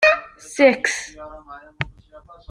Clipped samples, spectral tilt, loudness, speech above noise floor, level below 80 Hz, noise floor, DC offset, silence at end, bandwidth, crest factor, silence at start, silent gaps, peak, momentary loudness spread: under 0.1%; -3.5 dB/octave; -20 LUFS; 26 dB; -52 dBFS; -46 dBFS; under 0.1%; 0.3 s; 12 kHz; 20 dB; 0 s; none; -2 dBFS; 24 LU